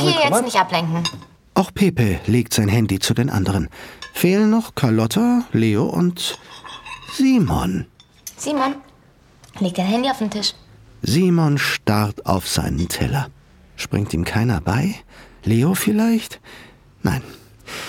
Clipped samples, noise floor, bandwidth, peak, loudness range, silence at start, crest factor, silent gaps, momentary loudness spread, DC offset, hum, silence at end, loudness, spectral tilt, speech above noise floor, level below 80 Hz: under 0.1%; -51 dBFS; 18 kHz; 0 dBFS; 4 LU; 0 s; 18 dB; none; 15 LU; under 0.1%; none; 0 s; -19 LUFS; -5.5 dB/octave; 32 dB; -40 dBFS